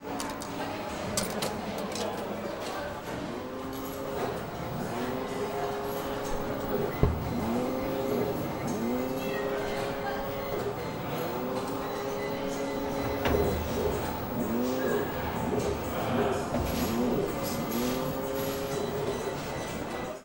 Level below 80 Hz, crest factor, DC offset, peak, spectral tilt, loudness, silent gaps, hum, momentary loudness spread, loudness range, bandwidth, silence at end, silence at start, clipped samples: -46 dBFS; 26 dB; under 0.1%; -6 dBFS; -5 dB/octave; -32 LUFS; none; none; 6 LU; 4 LU; 16 kHz; 0 s; 0 s; under 0.1%